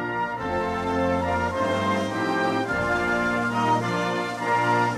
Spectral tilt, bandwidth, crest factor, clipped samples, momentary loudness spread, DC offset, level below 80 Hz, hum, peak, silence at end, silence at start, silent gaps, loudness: -5.5 dB/octave; 14 kHz; 14 dB; under 0.1%; 4 LU; under 0.1%; -48 dBFS; none; -10 dBFS; 0 s; 0 s; none; -24 LUFS